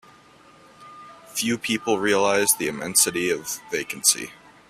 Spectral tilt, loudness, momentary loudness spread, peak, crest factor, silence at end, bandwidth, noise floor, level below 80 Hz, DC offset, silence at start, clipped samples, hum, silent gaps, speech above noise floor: -1.5 dB/octave; -22 LUFS; 9 LU; -2 dBFS; 22 dB; 0.35 s; 16 kHz; -52 dBFS; -62 dBFS; under 0.1%; 0.8 s; under 0.1%; none; none; 29 dB